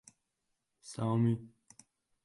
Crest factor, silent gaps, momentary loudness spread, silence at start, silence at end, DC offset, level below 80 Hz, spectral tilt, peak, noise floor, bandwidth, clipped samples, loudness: 18 dB; none; 24 LU; 0.85 s; 0.75 s; under 0.1%; -70 dBFS; -7.5 dB/octave; -20 dBFS; -84 dBFS; 11.5 kHz; under 0.1%; -33 LUFS